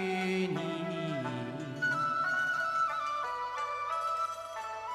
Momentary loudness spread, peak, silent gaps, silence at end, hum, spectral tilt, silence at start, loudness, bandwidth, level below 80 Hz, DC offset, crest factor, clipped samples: 8 LU; -20 dBFS; none; 0 s; none; -5 dB/octave; 0 s; -33 LUFS; 15 kHz; -72 dBFS; under 0.1%; 14 dB; under 0.1%